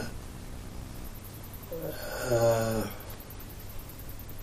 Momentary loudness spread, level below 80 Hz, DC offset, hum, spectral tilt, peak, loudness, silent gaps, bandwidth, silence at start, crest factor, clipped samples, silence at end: 18 LU; -44 dBFS; under 0.1%; none; -5.5 dB/octave; -14 dBFS; -34 LUFS; none; 15.5 kHz; 0 s; 20 dB; under 0.1%; 0 s